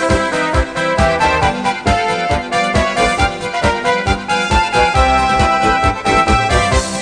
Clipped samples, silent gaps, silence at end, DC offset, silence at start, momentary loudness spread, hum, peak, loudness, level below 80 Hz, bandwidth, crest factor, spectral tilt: under 0.1%; none; 0 s; 0.2%; 0 s; 4 LU; none; 0 dBFS; -14 LUFS; -24 dBFS; 10 kHz; 14 dB; -4.5 dB/octave